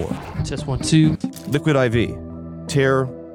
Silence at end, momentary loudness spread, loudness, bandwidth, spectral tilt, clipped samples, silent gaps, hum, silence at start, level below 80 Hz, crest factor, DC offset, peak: 0 s; 11 LU; -20 LUFS; 15.5 kHz; -6 dB/octave; under 0.1%; none; none; 0 s; -40 dBFS; 16 dB; under 0.1%; -4 dBFS